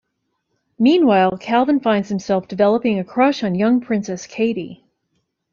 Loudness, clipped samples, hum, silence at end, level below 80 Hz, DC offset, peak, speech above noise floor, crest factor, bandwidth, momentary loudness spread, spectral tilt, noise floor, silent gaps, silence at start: -18 LUFS; under 0.1%; none; 0.8 s; -60 dBFS; under 0.1%; -2 dBFS; 56 dB; 16 dB; 7.4 kHz; 8 LU; -6.5 dB/octave; -73 dBFS; none; 0.8 s